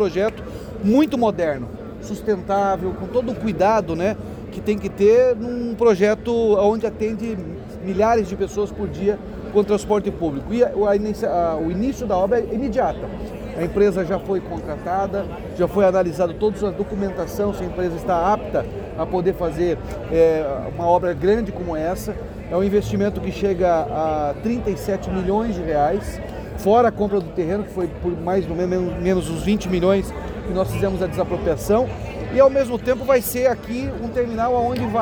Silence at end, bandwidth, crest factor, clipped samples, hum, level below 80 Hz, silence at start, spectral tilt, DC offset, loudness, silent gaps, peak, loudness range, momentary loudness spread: 0 s; over 20 kHz; 16 dB; under 0.1%; none; -38 dBFS; 0 s; -7 dB/octave; under 0.1%; -21 LUFS; none; -4 dBFS; 3 LU; 10 LU